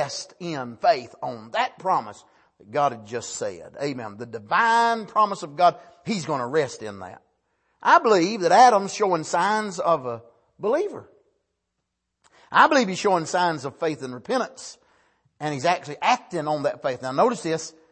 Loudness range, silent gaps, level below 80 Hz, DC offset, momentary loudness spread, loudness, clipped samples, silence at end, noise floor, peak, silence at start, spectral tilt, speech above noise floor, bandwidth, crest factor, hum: 7 LU; none; -72 dBFS; under 0.1%; 16 LU; -23 LUFS; under 0.1%; 0.2 s; -79 dBFS; -2 dBFS; 0 s; -4 dB/octave; 56 dB; 8.8 kHz; 22 dB; none